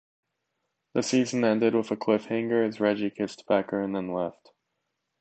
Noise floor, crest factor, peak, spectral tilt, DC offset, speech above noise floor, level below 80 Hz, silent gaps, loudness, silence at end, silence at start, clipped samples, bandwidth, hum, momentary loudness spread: -80 dBFS; 18 dB; -10 dBFS; -5.5 dB/octave; under 0.1%; 54 dB; -70 dBFS; none; -27 LUFS; 0.9 s; 0.95 s; under 0.1%; 8.8 kHz; none; 8 LU